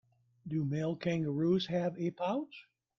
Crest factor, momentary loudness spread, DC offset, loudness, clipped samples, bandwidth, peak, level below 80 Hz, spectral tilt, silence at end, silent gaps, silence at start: 14 dB; 13 LU; under 0.1%; -34 LUFS; under 0.1%; 7.2 kHz; -20 dBFS; -70 dBFS; -7.5 dB/octave; 0.4 s; none; 0.45 s